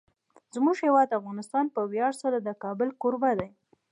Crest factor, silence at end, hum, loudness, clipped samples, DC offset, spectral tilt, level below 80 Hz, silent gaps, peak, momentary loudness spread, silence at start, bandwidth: 18 dB; 0.45 s; none; -27 LUFS; under 0.1%; under 0.1%; -6.5 dB/octave; -68 dBFS; none; -10 dBFS; 9 LU; 0.55 s; 11 kHz